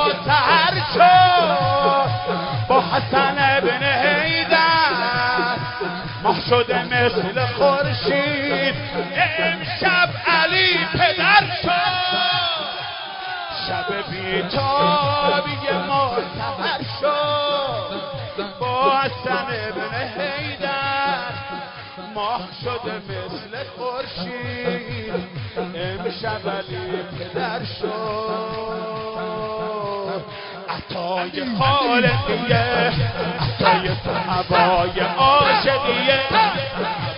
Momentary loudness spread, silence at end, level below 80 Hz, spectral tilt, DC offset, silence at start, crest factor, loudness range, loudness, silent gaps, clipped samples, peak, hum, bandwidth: 13 LU; 0 s; -46 dBFS; -9 dB/octave; under 0.1%; 0 s; 18 dB; 10 LU; -19 LUFS; none; under 0.1%; -2 dBFS; none; 5.4 kHz